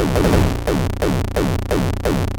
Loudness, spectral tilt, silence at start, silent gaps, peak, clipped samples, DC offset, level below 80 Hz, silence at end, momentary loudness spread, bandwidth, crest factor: -19 LUFS; -6.5 dB/octave; 0 s; none; -2 dBFS; under 0.1%; under 0.1%; -24 dBFS; 0 s; 5 LU; over 20 kHz; 14 dB